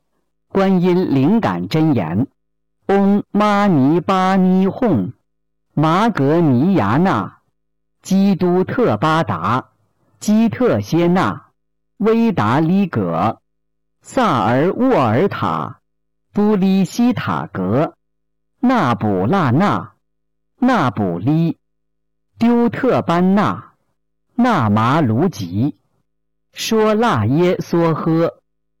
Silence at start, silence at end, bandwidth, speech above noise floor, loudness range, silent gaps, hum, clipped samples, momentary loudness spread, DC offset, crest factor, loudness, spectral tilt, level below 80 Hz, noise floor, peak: 0.55 s; 0.45 s; 17 kHz; 62 dB; 3 LU; none; none; under 0.1%; 8 LU; under 0.1%; 8 dB; -16 LUFS; -7.5 dB/octave; -52 dBFS; -77 dBFS; -8 dBFS